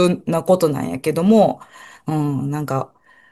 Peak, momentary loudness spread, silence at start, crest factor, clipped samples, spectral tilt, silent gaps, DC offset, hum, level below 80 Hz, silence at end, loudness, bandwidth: -4 dBFS; 13 LU; 0 s; 16 dB; under 0.1%; -7 dB/octave; none; under 0.1%; none; -56 dBFS; 0.45 s; -19 LUFS; 13 kHz